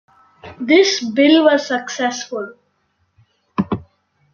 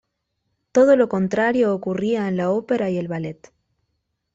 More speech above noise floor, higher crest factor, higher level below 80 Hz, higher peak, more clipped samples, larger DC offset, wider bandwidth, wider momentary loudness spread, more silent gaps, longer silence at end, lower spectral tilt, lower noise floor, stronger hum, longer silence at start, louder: second, 50 dB vs 55 dB; about the same, 16 dB vs 16 dB; about the same, -58 dBFS vs -62 dBFS; first, -2 dBFS vs -6 dBFS; neither; neither; about the same, 7.2 kHz vs 7.8 kHz; first, 16 LU vs 11 LU; neither; second, 0.5 s vs 1 s; second, -4 dB/octave vs -7 dB/octave; second, -65 dBFS vs -75 dBFS; neither; second, 0.45 s vs 0.75 s; first, -16 LUFS vs -20 LUFS